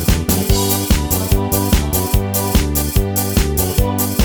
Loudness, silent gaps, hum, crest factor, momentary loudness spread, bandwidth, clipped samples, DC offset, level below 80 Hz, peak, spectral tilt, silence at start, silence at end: -16 LUFS; none; none; 14 dB; 2 LU; over 20 kHz; under 0.1%; under 0.1%; -20 dBFS; 0 dBFS; -4.5 dB/octave; 0 s; 0 s